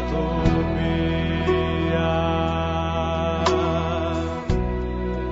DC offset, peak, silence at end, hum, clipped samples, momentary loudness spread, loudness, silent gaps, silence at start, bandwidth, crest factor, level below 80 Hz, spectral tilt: under 0.1%; -4 dBFS; 0 s; none; under 0.1%; 4 LU; -23 LUFS; none; 0 s; 8 kHz; 18 dB; -32 dBFS; -7 dB/octave